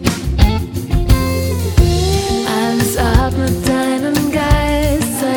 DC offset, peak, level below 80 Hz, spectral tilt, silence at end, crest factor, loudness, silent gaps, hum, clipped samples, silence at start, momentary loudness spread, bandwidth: under 0.1%; 0 dBFS; -20 dBFS; -5.5 dB/octave; 0 s; 14 dB; -15 LUFS; none; none; under 0.1%; 0 s; 4 LU; 19.5 kHz